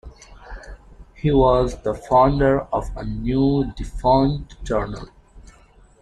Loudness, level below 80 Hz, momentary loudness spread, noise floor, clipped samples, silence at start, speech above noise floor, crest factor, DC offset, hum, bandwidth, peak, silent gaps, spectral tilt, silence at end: -20 LUFS; -34 dBFS; 18 LU; -51 dBFS; under 0.1%; 0.05 s; 32 dB; 18 dB; under 0.1%; none; 10.5 kHz; -4 dBFS; none; -8 dB/octave; 0.55 s